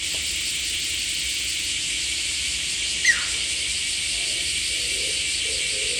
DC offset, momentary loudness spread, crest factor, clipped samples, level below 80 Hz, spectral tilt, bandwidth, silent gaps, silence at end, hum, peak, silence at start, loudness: under 0.1%; 4 LU; 18 dB; under 0.1%; -46 dBFS; 1 dB/octave; 19 kHz; none; 0 s; none; -6 dBFS; 0 s; -22 LUFS